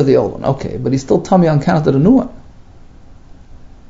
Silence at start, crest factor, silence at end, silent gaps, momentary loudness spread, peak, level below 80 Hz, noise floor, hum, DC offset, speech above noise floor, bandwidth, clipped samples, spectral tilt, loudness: 0 s; 14 dB; 0.25 s; none; 8 LU; 0 dBFS; -38 dBFS; -38 dBFS; none; under 0.1%; 25 dB; 7.8 kHz; under 0.1%; -8 dB/octave; -14 LUFS